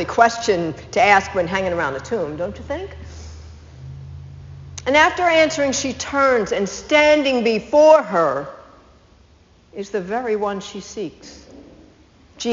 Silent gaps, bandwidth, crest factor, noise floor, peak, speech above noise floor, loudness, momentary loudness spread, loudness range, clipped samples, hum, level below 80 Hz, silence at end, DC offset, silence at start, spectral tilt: none; 7.6 kHz; 20 dB; -52 dBFS; 0 dBFS; 34 dB; -18 LUFS; 23 LU; 12 LU; under 0.1%; none; -46 dBFS; 0 s; under 0.1%; 0 s; -2.5 dB/octave